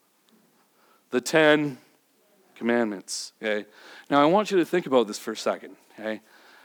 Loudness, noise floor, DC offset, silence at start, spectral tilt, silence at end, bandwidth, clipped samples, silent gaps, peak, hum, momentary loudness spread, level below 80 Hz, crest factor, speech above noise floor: -25 LUFS; -63 dBFS; under 0.1%; 1.1 s; -4.5 dB/octave; 0.45 s; over 20 kHz; under 0.1%; none; -6 dBFS; none; 15 LU; under -90 dBFS; 20 dB; 39 dB